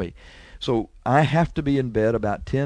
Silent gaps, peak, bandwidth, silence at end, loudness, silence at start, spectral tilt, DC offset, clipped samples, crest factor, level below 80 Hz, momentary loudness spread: none; -4 dBFS; 10.5 kHz; 0 s; -22 LUFS; 0 s; -7.5 dB/octave; under 0.1%; under 0.1%; 18 dB; -42 dBFS; 7 LU